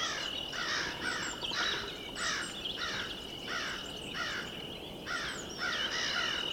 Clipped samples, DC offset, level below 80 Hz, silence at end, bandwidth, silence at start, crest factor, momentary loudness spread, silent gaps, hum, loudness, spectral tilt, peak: under 0.1%; under 0.1%; -58 dBFS; 0 s; 19 kHz; 0 s; 18 dB; 7 LU; none; none; -35 LUFS; -1.5 dB/octave; -20 dBFS